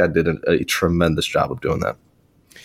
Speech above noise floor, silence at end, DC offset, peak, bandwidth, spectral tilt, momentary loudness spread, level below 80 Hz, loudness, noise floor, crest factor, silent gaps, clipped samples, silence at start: 36 dB; 0.05 s; under 0.1%; -2 dBFS; 16.5 kHz; -5 dB/octave; 6 LU; -40 dBFS; -20 LUFS; -55 dBFS; 18 dB; none; under 0.1%; 0 s